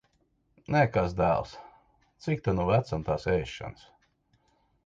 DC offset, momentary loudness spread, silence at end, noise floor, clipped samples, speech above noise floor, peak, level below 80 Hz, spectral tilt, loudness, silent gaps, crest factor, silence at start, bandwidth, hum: under 0.1%; 16 LU; 1.15 s; -71 dBFS; under 0.1%; 43 dB; -10 dBFS; -48 dBFS; -7.5 dB/octave; -28 LUFS; none; 20 dB; 0.7 s; 7.8 kHz; none